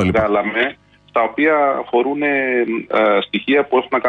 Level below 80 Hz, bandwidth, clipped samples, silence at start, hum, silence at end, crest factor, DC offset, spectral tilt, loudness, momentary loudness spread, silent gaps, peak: -48 dBFS; 8 kHz; under 0.1%; 0 s; 50 Hz at -55 dBFS; 0 s; 14 dB; under 0.1%; -7 dB/octave; -17 LUFS; 4 LU; none; -4 dBFS